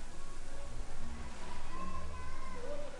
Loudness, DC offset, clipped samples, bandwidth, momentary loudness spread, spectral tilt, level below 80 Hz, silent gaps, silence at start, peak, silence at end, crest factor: -47 LUFS; under 0.1%; under 0.1%; 10.5 kHz; 5 LU; -5 dB/octave; -40 dBFS; none; 0 s; -24 dBFS; 0 s; 10 dB